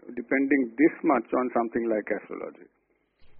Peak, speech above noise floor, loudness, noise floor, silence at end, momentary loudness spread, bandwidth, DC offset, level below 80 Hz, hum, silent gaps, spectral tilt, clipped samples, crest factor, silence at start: -10 dBFS; 32 dB; -26 LUFS; -58 dBFS; 0 s; 14 LU; 3.2 kHz; under 0.1%; -66 dBFS; none; none; -7.5 dB/octave; under 0.1%; 18 dB; 0.05 s